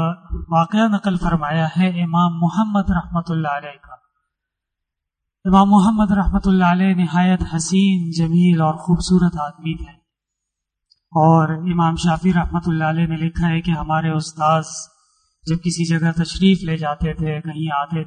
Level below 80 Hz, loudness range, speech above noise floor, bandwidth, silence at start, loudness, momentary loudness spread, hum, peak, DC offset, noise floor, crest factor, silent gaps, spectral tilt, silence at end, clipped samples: -34 dBFS; 5 LU; 64 dB; 9.6 kHz; 0 s; -18 LUFS; 10 LU; none; -2 dBFS; under 0.1%; -81 dBFS; 16 dB; none; -6.5 dB/octave; 0 s; under 0.1%